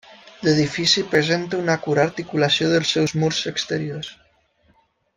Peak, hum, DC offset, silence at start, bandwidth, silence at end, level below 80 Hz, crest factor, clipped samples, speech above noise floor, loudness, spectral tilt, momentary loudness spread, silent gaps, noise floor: -2 dBFS; none; under 0.1%; 0.1 s; 10 kHz; 1.05 s; -58 dBFS; 18 dB; under 0.1%; 41 dB; -20 LUFS; -4.5 dB/octave; 8 LU; none; -61 dBFS